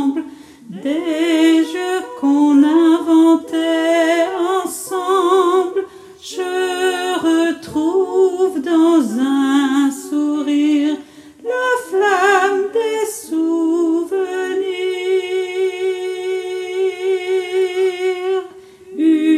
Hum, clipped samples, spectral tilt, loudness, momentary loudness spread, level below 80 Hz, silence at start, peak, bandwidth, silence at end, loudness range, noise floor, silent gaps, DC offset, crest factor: none; under 0.1%; -3.5 dB/octave; -16 LUFS; 10 LU; -66 dBFS; 0 s; -2 dBFS; 14.5 kHz; 0 s; 5 LU; -38 dBFS; none; under 0.1%; 14 dB